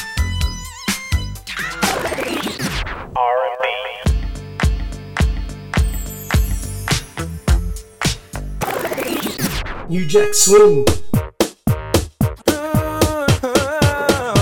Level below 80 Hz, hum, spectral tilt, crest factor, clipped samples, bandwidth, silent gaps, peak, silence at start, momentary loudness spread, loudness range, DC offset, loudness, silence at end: -26 dBFS; none; -4.5 dB/octave; 16 dB; under 0.1%; over 20 kHz; none; -2 dBFS; 0 s; 9 LU; 6 LU; under 0.1%; -19 LUFS; 0 s